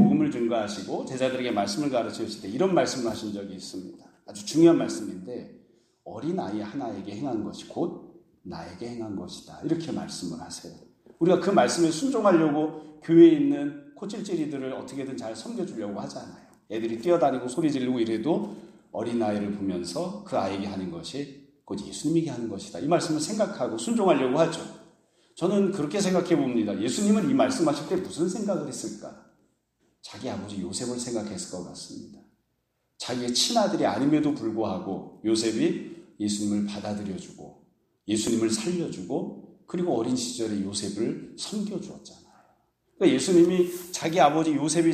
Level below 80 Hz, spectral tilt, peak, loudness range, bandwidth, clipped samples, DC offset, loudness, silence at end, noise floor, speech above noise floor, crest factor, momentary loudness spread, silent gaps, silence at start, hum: -66 dBFS; -5 dB/octave; -6 dBFS; 10 LU; 14 kHz; under 0.1%; under 0.1%; -26 LUFS; 0 s; -75 dBFS; 49 dB; 22 dB; 16 LU; none; 0 s; none